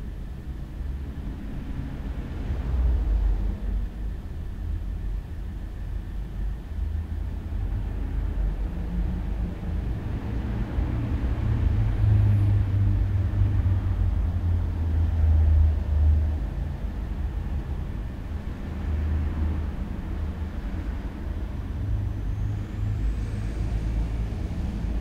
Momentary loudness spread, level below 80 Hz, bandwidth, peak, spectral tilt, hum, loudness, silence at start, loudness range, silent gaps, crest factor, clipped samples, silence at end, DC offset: 12 LU; -28 dBFS; 6.6 kHz; -12 dBFS; -9 dB/octave; none; -28 LUFS; 0 s; 9 LU; none; 14 dB; under 0.1%; 0 s; under 0.1%